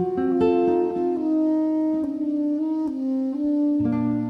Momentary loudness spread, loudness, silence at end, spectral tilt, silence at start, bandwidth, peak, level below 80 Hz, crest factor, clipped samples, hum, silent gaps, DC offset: 5 LU; -23 LUFS; 0 s; -9.5 dB/octave; 0 s; 5.2 kHz; -10 dBFS; -60 dBFS; 12 dB; under 0.1%; none; none; under 0.1%